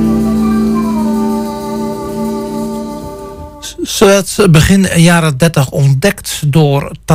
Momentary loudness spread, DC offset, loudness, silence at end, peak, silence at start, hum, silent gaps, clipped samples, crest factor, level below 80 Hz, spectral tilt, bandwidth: 15 LU; under 0.1%; -11 LUFS; 0 s; 0 dBFS; 0 s; none; none; under 0.1%; 12 dB; -30 dBFS; -5.5 dB/octave; 16 kHz